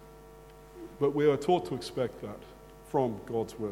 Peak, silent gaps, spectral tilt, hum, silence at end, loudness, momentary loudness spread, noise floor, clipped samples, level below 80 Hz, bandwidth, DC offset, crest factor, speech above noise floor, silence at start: -12 dBFS; none; -6.5 dB/octave; none; 0 s; -31 LUFS; 25 LU; -51 dBFS; under 0.1%; -58 dBFS; 16.5 kHz; under 0.1%; 20 dB; 21 dB; 0 s